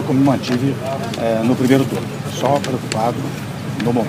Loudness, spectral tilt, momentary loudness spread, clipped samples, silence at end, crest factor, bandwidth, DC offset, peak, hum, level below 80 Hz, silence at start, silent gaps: -19 LUFS; -6 dB/octave; 9 LU; under 0.1%; 0 s; 18 dB; 15.5 kHz; under 0.1%; 0 dBFS; none; -52 dBFS; 0 s; none